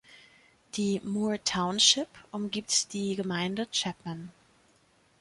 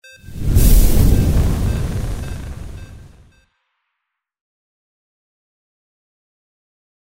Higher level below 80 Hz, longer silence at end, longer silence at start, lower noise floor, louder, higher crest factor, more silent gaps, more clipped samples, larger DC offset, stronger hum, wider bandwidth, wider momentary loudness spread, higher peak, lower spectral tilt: second, -66 dBFS vs -20 dBFS; second, 0.9 s vs 4.05 s; second, 0.1 s vs 0.25 s; second, -65 dBFS vs -78 dBFS; second, -28 LUFS vs -18 LUFS; first, 24 dB vs 16 dB; neither; neither; neither; neither; second, 11.5 kHz vs 16.5 kHz; second, 17 LU vs 21 LU; second, -8 dBFS vs -2 dBFS; second, -2.5 dB/octave vs -6 dB/octave